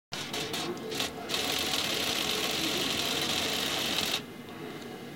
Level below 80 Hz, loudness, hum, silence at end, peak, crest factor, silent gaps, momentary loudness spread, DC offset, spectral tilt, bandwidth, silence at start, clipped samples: -60 dBFS; -29 LUFS; none; 0 s; -12 dBFS; 20 dB; none; 13 LU; under 0.1%; -2 dB/octave; 17 kHz; 0.1 s; under 0.1%